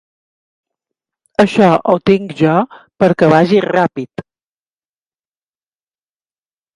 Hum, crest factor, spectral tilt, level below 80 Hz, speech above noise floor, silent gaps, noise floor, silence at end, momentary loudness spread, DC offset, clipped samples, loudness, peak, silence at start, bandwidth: none; 16 dB; -7.5 dB/octave; -54 dBFS; over 78 dB; none; under -90 dBFS; 2.55 s; 14 LU; under 0.1%; under 0.1%; -13 LUFS; 0 dBFS; 1.4 s; 11 kHz